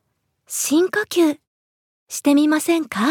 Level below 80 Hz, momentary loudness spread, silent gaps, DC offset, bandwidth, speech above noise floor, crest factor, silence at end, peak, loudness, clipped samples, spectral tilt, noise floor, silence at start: -74 dBFS; 12 LU; 1.47-2.07 s; under 0.1%; 18 kHz; 44 dB; 16 dB; 0 s; -4 dBFS; -19 LUFS; under 0.1%; -3 dB/octave; -62 dBFS; 0.5 s